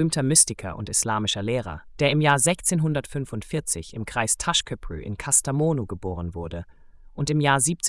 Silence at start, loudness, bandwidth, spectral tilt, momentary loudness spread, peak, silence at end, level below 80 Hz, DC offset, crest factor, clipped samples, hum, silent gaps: 0 s; -23 LUFS; 12 kHz; -3.5 dB/octave; 14 LU; -4 dBFS; 0 s; -46 dBFS; under 0.1%; 20 dB; under 0.1%; none; none